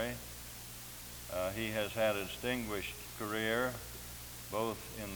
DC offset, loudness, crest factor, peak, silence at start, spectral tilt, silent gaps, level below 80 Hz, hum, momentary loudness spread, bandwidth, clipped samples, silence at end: under 0.1%; -38 LUFS; 18 dB; -20 dBFS; 0 s; -3.5 dB/octave; none; -56 dBFS; none; 12 LU; over 20 kHz; under 0.1%; 0 s